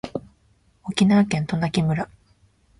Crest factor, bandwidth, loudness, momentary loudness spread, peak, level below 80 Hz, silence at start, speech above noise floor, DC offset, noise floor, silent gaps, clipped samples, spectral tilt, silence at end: 22 dB; 11 kHz; -21 LUFS; 17 LU; -2 dBFS; -52 dBFS; 0.05 s; 41 dB; under 0.1%; -61 dBFS; none; under 0.1%; -6.5 dB/octave; 0.75 s